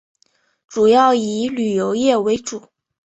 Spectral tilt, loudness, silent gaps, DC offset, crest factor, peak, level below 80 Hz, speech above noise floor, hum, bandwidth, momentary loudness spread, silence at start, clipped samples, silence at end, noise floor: -4.5 dB/octave; -17 LUFS; none; under 0.1%; 16 dB; -2 dBFS; -58 dBFS; 46 dB; none; 8.2 kHz; 15 LU; 0.7 s; under 0.1%; 0.45 s; -62 dBFS